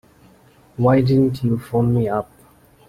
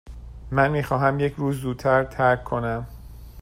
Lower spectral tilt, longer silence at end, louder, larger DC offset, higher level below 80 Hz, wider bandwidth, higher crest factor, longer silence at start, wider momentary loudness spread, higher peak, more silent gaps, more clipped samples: first, -9.5 dB/octave vs -7.5 dB/octave; first, 0.65 s vs 0 s; first, -18 LUFS vs -23 LUFS; neither; second, -48 dBFS vs -42 dBFS; second, 14 kHz vs 16 kHz; about the same, 16 dB vs 18 dB; first, 0.8 s vs 0.05 s; second, 13 LU vs 19 LU; about the same, -4 dBFS vs -6 dBFS; neither; neither